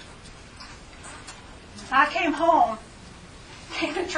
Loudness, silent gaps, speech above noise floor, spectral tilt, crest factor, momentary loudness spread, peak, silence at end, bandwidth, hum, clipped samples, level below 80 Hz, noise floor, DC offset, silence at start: -23 LUFS; none; 23 dB; -3.5 dB/octave; 22 dB; 24 LU; -6 dBFS; 0 s; 10.5 kHz; none; under 0.1%; -50 dBFS; -45 dBFS; under 0.1%; 0 s